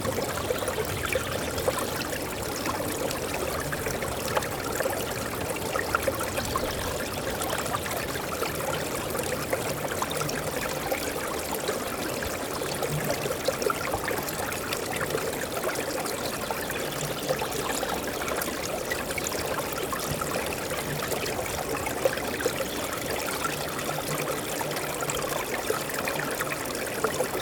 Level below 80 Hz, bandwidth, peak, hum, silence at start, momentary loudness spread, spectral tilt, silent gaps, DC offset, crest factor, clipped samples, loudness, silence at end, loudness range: -48 dBFS; over 20 kHz; -10 dBFS; none; 0 s; 2 LU; -3 dB/octave; none; under 0.1%; 20 dB; under 0.1%; -29 LUFS; 0 s; 1 LU